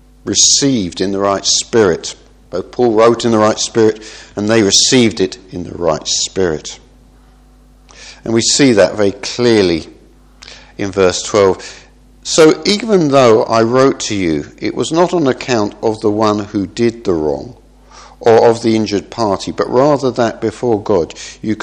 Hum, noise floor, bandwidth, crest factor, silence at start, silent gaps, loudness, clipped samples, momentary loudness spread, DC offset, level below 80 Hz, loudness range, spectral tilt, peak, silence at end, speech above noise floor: none; -44 dBFS; 11.5 kHz; 14 dB; 0.25 s; none; -13 LUFS; 0.1%; 13 LU; under 0.1%; -44 dBFS; 4 LU; -3.5 dB/octave; 0 dBFS; 0 s; 31 dB